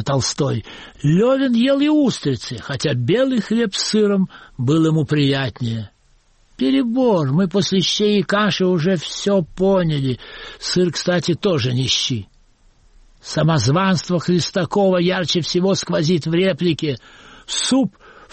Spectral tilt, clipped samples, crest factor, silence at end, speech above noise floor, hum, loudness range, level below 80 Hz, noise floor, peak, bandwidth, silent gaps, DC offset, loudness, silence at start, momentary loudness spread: -5.5 dB/octave; under 0.1%; 12 dB; 0.45 s; 38 dB; none; 2 LU; -50 dBFS; -55 dBFS; -6 dBFS; 8.8 kHz; none; under 0.1%; -18 LUFS; 0 s; 9 LU